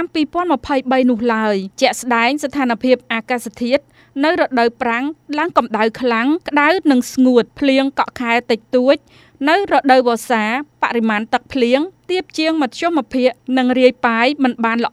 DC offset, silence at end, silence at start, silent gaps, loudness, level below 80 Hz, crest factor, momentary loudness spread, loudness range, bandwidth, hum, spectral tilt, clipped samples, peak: under 0.1%; 0.05 s; 0 s; none; -16 LUFS; -54 dBFS; 16 dB; 6 LU; 2 LU; 14.5 kHz; none; -4 dB/octave; under 0.1%; 0 dBFS